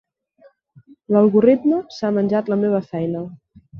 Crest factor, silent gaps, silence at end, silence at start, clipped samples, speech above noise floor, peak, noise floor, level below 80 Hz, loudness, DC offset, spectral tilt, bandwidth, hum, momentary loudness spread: 18 dB; none; 0 s; 1.1 s; under 0.1%; 36 dB; -2 dBFS; -54 dBFS; -62 dBFS; -18 LUFS; under 0.1%; -9 dB/octave; 6.6 kHz; none; 11 LU